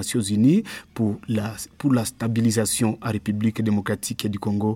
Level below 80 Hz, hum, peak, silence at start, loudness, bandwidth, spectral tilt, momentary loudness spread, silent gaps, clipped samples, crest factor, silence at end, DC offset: -56 dBFS; none; -8 dBFS; 0 s; -23 LUFS; 17 kHz; -5.5 dB/octave; 8 LU; none; under 0.1%; 16 dB; 0 s; under 0.1%